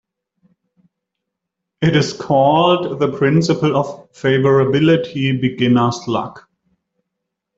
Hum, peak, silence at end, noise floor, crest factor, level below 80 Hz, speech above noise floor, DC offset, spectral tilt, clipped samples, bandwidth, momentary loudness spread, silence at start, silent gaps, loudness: none; -2 dBFS; 1.2 s; -79 dBFS; 14 dB; -54 dBFS; 64 dB; under 0.1%; -6.5 dB/octave; under 0.1%; 7.8 kHz; 8 LU; 1.8 s; none; -16 LUFS